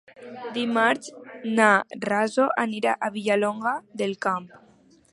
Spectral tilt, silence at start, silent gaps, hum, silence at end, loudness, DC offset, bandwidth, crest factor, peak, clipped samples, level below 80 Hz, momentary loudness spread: -4.5 dB/octave; 0.2 s; none; none; 0.55 s; -24 LUFS; under 0.1%; 11.5 kHz; 22 dB; -4 dBFS; under 0.1%; -74 dBFS; 13 LU